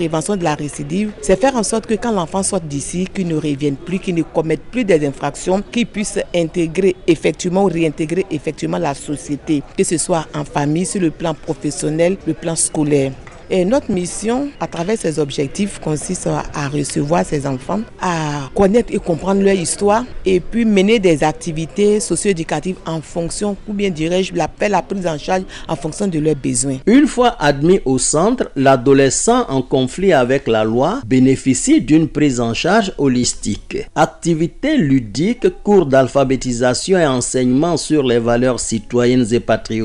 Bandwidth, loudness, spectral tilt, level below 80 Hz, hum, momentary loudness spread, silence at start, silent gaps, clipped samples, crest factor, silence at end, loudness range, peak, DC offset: 11.5 kHz; -16 LUFS; -5 dB/octave; -36 dBFS; none; 8 LU; 0 s; none; under 0.1%; 14 dB; 0 s; 5 LU; -2 dBFS; under 0.1%